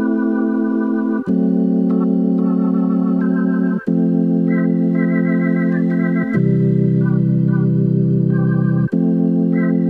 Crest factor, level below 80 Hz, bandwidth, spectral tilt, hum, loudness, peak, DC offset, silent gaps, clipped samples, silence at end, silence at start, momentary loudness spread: 10 dB; -54 dBFS; 3.1 kHz; -12 dB/octave; none; -16 LUFS; -6 dBFS; under 0.1%; none; under 0.1%; 0 s; 0 s; 2 LU